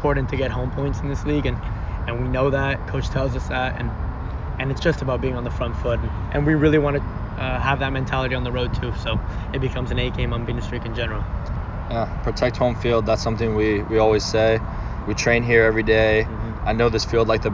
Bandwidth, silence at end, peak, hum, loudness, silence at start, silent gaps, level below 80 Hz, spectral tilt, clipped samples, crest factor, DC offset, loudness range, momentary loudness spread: 7.6 kHz; 0 s; -4 dBFS; none; -22 LUFS; 0 s; none; -30 dBFS; -6 dB/octave; under 0.1%; 18 dB; under 0.1%; 6 LU; 10 LU